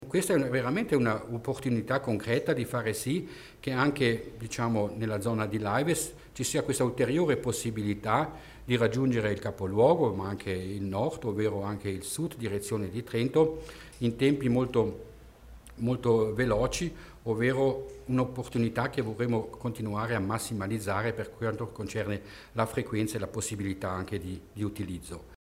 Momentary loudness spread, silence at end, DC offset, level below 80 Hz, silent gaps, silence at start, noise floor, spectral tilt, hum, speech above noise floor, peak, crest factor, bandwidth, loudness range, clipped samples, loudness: 10 LU; 0.05 s; under 0.1%; -54 dBFS; none; 0 s; -50 dBFS; -5.5 dB/octave; none; 21 dB; -10 dBFS; 20 dB; 16 kHz; 4 LU; under 0.1%; -30 LUFS